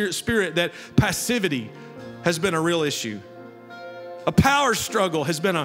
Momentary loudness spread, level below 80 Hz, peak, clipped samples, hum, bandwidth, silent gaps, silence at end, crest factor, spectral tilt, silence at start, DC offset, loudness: 20 LU; -48 dBFS; -2 dBFS; under 0.1%; none; 16 kHz; none; 0 s; 20 dB; -4.5 dB/octave; 0 s; under 0.1%; -22 LUFS